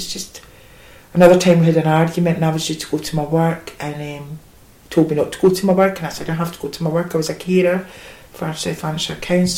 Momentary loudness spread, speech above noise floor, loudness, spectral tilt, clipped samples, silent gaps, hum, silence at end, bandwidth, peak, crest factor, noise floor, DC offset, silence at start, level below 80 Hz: 16 LU; 26 dB; -18 LUFS; -6 dB/octave; under 0.1%; none; none; 0 s; 16.5 kHz; 0 dBFS; 18 dB; -43 dBFS; under 0.1%; 0 s; -48 dBFS